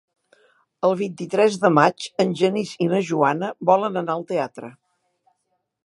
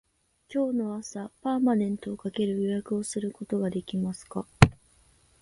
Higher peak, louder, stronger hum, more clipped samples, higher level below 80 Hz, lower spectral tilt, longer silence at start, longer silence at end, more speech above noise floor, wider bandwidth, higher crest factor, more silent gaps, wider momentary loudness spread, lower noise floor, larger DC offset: about the same, -2 dBFS vs 0 dBFS; first, -21 LUFS vs -28 LUFS; neither; neither; second, -74 dBFS vs -48 dBFS; about the same, -6 dB/octave vs -6.5 dB/octave; first, 0.85 s vs 0.5 s; first, 1.15 s vs 0.7 s; first, 54 dB vs 33 dB; about the same, 11.5 kHz vs 11.5 kHz; second, 22 dB vs 28 dB; neither; second, 9 LU vs 12 LU; first, -74 dBFS vs -62 dBFS; neither